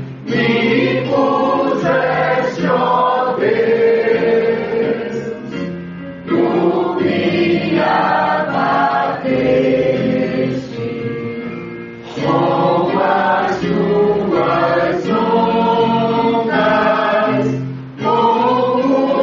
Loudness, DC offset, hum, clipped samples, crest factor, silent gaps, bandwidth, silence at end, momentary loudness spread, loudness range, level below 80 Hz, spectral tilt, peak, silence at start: -15 LUFS; under 0.1%; none; under 0.1%; 12 dB; none; 7.4 kHz; 0 s; 10 LU; 3 LU; -50 dBFS; -7.5 dB/octave; -2 dBFS; 0 s